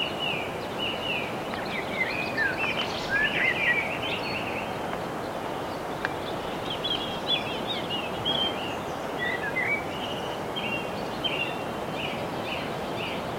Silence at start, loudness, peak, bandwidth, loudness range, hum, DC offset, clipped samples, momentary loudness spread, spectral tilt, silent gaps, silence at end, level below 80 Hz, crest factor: 0 s; -28 LUFS; -10 dBFS; 16.5 kHz; 4 LU; none; under 0.1%; under 0.1%; 7 LU; -4 dB/octave; none; 0 s; -54 dBFS; 20 dB